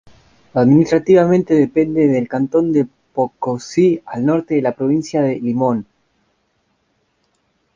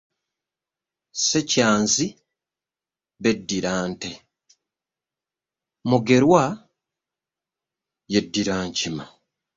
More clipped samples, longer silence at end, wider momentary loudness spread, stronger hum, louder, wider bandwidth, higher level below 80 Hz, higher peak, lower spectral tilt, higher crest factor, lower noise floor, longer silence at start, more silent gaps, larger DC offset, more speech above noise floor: neither; first, 1.95 s vs 0.5 s; second, 9 LU vs 15 LU; neither; first, -16 LUFS vs -21 LUFS; about the same, 7.6 kHz vs 7.8 kHz; about the same, -54 dBFS vs -58 dBFS; about the same, -2 dBFS vs -4 dBFS; first, -8 dB/octave vs -4 dB/octave; second, 16 dB vs 22 dB; second, -65 dBFS vs under -90 dBFS; second, 0.55 s vs 1.15 s; neither; neither; second, 50 dB vs over 69 dB